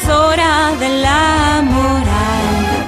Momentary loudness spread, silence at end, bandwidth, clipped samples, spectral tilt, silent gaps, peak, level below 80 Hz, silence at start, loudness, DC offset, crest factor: 4 LU; 0 s; 15.5 kHz; under 0.1%; -4.5 dB/octave; none; -4 dBFS; -26 dBFS; 0 s; -13 LUFS; under 0.1%; 10 dB